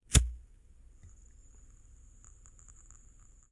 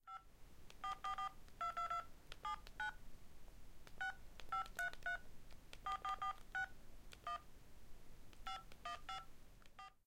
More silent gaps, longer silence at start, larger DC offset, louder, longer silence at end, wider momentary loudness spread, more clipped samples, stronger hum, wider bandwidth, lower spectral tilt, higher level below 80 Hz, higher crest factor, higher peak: neither; about the same, 0.1 s vs 0.05 s; neither; first, -30 LUFS vs -48 LUFS; first, 3.15 s vs 0.1 s; first, 31 LU vs 21 LU; neither; neither; second, 11.5 kHz vs 16.5 kHz; about the same, -3 dB/octave vs -2.5 dB/octave; first, -40 dBFS vs -60 dBFS; first, 30 dB vs 18 dB; first, -6 dBFS vs -32 dBFS